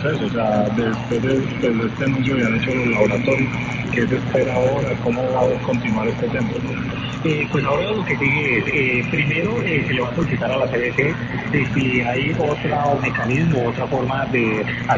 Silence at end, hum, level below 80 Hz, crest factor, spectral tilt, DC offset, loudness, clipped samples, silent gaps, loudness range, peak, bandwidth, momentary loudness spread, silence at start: 0 s; none; -42 dBFS; 16 dB; -7 dB/octave; under 0.1%; -19 LUFS; under 0.1%; none; 2 LU; -2 dBFS; 7.6 kHz; 4 LU; 0 s